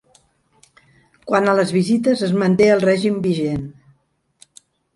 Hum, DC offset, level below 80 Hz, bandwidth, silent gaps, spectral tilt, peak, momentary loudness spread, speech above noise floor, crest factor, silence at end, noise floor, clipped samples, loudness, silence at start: none; under 0.1%; -54 dBFS; 11.5 kHz; none; -6.5 dB/octave; -2 dBFS; 11 LU; 47 dB; 18 dB; 1.25 s; -64 dBFS; under 0.1%; -17 LUFS; 1.25 s